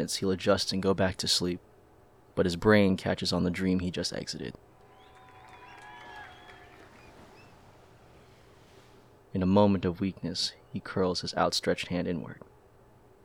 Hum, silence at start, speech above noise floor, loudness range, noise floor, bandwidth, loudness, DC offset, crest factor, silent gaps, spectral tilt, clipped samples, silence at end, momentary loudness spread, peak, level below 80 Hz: none; 0 s; 30 dB; 23 LU; -59 dBFS; 16 kHz; -29 LUFS; under 0.1%; 22 dB; none; -5 dB/octave; under 0.1%; 0.9 s; 23 LU; -8 dBFS; -58 dBFS